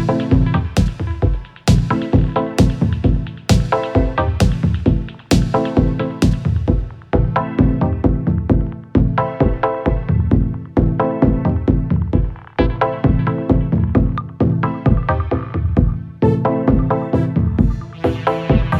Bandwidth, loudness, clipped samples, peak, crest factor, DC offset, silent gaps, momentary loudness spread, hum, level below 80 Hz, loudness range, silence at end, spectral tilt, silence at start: 12.5 kHz; -17 LUFS; under 0.1%; 0 dBFS; 16 dB; under 0.1%; none; 4 LU; none; -22 dBFS; 1 LU; 0 s; -8 dB/octave; 0 s